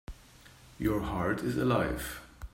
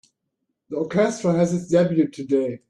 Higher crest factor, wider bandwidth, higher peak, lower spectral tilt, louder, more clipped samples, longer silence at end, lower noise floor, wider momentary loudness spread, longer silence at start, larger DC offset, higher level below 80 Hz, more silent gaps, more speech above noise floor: about the same, 18 dB vs 16 dB; first, 16 kHz vs 11 kHz; second, -16 dBFS vs -6 dBFS; about the same, -6.5 dB/octave vs -7 dB/octave; second, -32 LUFS vs -21 LUFS; neither; about the same, 0.05 s vs 0.15 s; second, -56 dBFS vs -77 dBFS; first, 17 LU vs 6 LU; second, 0.1 s vs 0.7 s; neither; first, -46 dBFS vs -62 dBFS; neither; second, 25 dB vs 57 dB